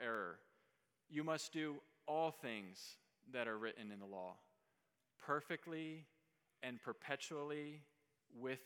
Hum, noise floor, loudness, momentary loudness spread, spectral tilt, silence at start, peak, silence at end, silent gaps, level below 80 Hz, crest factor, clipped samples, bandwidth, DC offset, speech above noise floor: none; -86 dBFS; -47 LUFS; 14 LU; -4.5 dB/octave; 0 s; -26 dBFS; 0 s; none; under -90 dBFS; 24 dB; under 0.1%; 18 kHz; under 0.1%; 39 dB